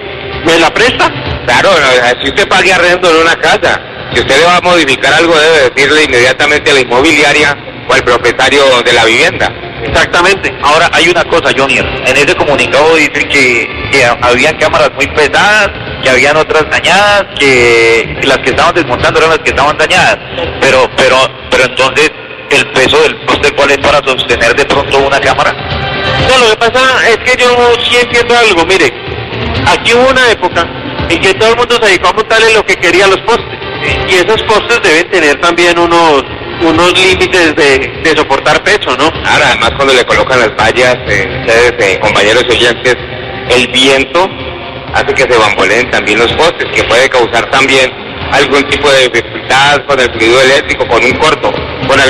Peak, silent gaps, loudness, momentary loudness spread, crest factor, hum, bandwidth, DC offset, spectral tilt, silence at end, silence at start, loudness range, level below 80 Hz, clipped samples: 0 dBFS; none; -7 LUFS; 6 LU; 8 dB; none; 14 kHz; 0.6%; -3.5 dB/octave; 0 s; 0 s; 2 LU; -30 dBFS; 0.5%